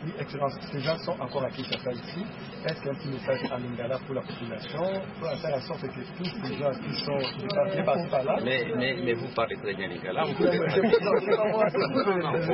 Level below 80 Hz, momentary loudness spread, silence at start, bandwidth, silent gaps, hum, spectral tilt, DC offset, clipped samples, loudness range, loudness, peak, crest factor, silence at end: -60 dBFS; 11 LU; 0 s; 5.8 kHz; none; none; -10 dB/octave; under 0.1%; under 0.1%; 7 LU; -29 LUFS; -8 dBFS; 20 dB; 0 s